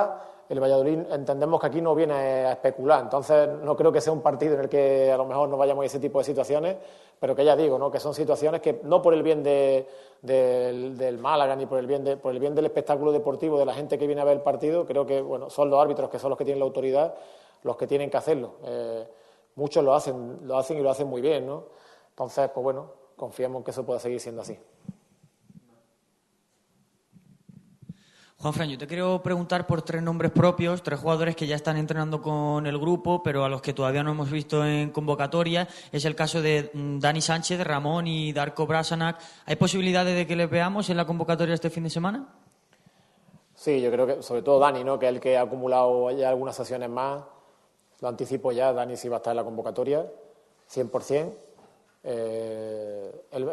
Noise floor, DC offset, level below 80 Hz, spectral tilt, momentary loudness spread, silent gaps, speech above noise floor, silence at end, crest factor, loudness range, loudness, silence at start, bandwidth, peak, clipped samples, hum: -70 dBFS; under 0.1%; -66 dBFS; -6 dB/octave; 11 LU; none; 45 dB; 0 s; 20 dB; 8 LU; -25 LUFS; 0 s; 12.5 kHz; -6 dBFS; under 0.1%; none